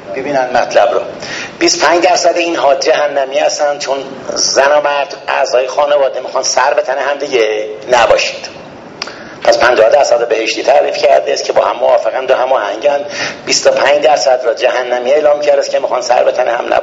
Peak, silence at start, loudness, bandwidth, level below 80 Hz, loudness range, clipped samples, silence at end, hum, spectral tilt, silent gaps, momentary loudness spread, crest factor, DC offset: 0 dBFS; 0 s; -11 LUFS; 8 kHz; -52 dBFS; 2 LU; 0.2%; 0 s; none; -1.5 dB/octave; none; 9 LU; 12 dB; under 0.1%